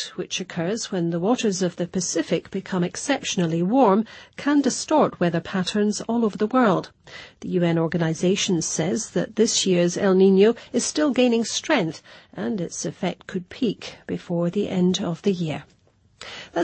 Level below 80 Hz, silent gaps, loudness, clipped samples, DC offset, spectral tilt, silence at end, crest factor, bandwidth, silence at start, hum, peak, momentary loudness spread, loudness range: -62 dBFS; none; -22 LUFS; under 0.1%; under 0.1%; -5 dB/octave; 0 s; 18 dB; 8.8 kHz; 0 s; none; -6 dBFS; 13 LU; 6 LU